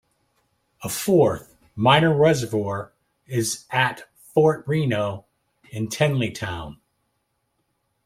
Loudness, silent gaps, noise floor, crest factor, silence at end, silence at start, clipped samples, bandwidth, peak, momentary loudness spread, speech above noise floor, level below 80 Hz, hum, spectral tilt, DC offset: -22 LUFS; none; -73 dBFS; 22 dB; 1.35 s; 0.8 s; under 0.1%; 16.5 kHz; -2 dBFS; 19 LU; 52 dB; -56 dBFS; none; -5 dB/octave; under 0.1%